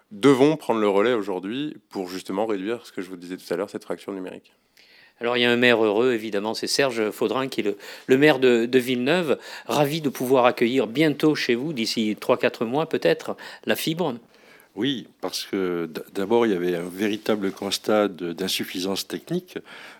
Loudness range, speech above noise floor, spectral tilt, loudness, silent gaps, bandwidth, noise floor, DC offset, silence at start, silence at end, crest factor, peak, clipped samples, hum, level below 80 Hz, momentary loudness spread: 7 LU; 31 dB; -4.5 dB/octave; -23 LUFS; none; 19 kHz; -54 dBFS; under 0.1%; 0.1 s; 0.05 s; 20 dB; -2 dBFS; under 0.1%; none; -78 dBFS; 13 LU